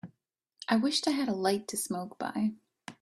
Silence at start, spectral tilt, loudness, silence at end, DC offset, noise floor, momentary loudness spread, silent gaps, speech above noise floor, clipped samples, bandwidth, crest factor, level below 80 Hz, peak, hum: 0.05 s; -3.5 dB/octave; -31 LUFS; 0.1 s; under 0.1%; -76 dBFS; 14 LU; none; 45 dB; under 0.1%; 15.5 kHz; 18 dB; -74 dBFS; -14 dBFS; none